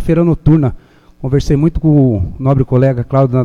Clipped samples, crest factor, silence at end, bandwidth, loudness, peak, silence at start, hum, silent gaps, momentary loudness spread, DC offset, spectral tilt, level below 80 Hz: under 0.1%; 12 dB; 0 s; 7.2 kHz; -13 LUFS; 0 dBFS; 0 s; none; none; 6 LU; under 0.1%; -9.5 dB/octave; -26 dBFS